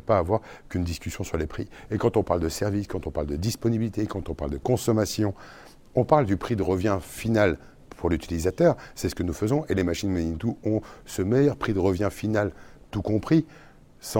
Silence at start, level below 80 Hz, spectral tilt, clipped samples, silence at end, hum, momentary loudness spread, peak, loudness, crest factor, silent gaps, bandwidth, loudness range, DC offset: 0.05 s; -44 dBFS; -6.5 dB/octave; under 0.1%; 0 s; none; 10 LU; -4 dBFS; -26 LUFS; 22 dB; none; 17 kHz; 3 LU; under 0.1%